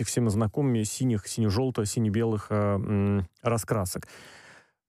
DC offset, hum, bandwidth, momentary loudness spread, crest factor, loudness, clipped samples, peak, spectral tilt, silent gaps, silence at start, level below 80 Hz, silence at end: under 0.1%; none; 15.5 kHz; 3 LU; 14 dB; -27 LUFS; under 0.1%; -14 dBFS; -6 dB/octave; none; 0 s; -56 dBFS; 0.35 s